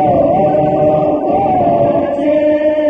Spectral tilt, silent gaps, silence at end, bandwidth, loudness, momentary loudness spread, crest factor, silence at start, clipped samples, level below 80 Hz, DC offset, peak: -9.5 dB/octave; none; 0 s; 4.9 kHz; -12 LUFS; 2 LU; 10 dB; 0 s; under 0.1%; -42 dBFS; 0.1%; -2 dBFS